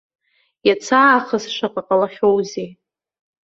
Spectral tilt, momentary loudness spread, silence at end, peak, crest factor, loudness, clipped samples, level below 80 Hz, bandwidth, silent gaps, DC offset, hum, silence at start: -4 dB/octave; 13 LU; 0.7 s; -2 dBFS; 18 dB; -17 LUFS; under 0.1%; -62 dBFS; 8 kHz; none; under 0.1%; none; 0.65 s